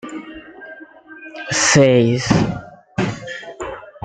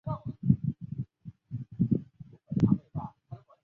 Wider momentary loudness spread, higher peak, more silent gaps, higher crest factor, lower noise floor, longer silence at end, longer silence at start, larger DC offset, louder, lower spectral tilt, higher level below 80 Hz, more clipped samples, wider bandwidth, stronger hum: first, 25 LU vs 22 LU; first, -2 dBFS vs -8 dBFS; neither; about the same, 18 dB vs 22 dB; second, -40 dBFS vs -51 dBFS; second, 0.05 s vs 0.25 s; about the same, 0.05 s vs 0.05 s; neither; first, -16 LUFS vs -31 LUFS; second, -4.5 dB/octave vs -11.5 dB/octave; first, -46 dBFS vs -54 dBFS; neither; first, 9.4 kHz vs 5.2 kHz; neither